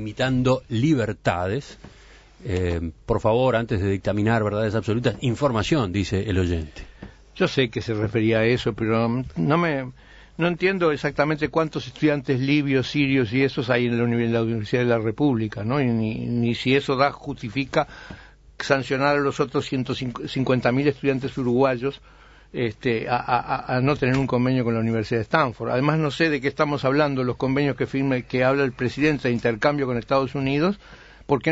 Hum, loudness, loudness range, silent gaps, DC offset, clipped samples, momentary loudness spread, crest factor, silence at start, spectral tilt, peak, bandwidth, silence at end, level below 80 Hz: none; -23 LUFS; 2 LU; none; under 0.1%; under 0.1%; 7 LU; 18 dB; 0 s; -7 dB/octave; -4 dBFS; 8 kHz; 0 s; -46 dBFS